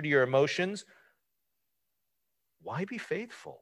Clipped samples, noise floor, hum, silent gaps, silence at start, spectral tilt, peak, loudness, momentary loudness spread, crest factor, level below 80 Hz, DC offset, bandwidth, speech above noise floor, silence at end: under 0.1%; -83 dBFS; none; none; 0 s; -5.5 dB/octave; -12 dBFS; -31 LUFS; 18 LU; 22 dB; -78 dBFS; under 0.1%; 12 kHz; 53 dB; 0.05 s